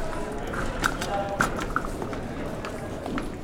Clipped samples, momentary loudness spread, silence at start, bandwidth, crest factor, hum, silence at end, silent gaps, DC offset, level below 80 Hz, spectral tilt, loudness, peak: under 0.1%; 7 LU; 0 s; 18.5 kHz; 24 dB; none; 0 s; none; under 0.1%; -36 dBFS; -4.5 dB/octave; -30 LUFS; -6 dBFS